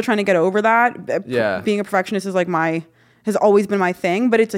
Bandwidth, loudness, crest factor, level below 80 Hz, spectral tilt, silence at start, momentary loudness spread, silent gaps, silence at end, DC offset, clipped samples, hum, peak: 16 kHz; -18 LUFS; 16 dB; -64 dBFS; -6 dB/octave; 0 s; 7 LU; none; 0 s; under 0.1%; under 0.1%; none; -2 dBFS